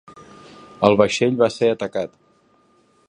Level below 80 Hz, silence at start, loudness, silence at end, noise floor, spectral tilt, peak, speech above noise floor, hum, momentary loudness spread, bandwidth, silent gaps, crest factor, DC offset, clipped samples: -56 dBFS; 0.15 s; -19 LUFS; 1 s; -58 dBFS; -5.5 dB/octave; 0 dBFS; 40 dB; none; 11 LU; 10.5 kHz; none; 20 dB; under 0.1%; under 0.1%